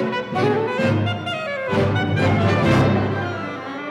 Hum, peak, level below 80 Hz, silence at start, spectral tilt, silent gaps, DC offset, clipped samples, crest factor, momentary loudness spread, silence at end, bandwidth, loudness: none; -6 dBFS; -44 dBFS; 0 s; -7 dB/octave; none; under 0.1%; under 0.1%; 14 dB; 9 LU; 0 s; 10.5 kHz; -20 LUFS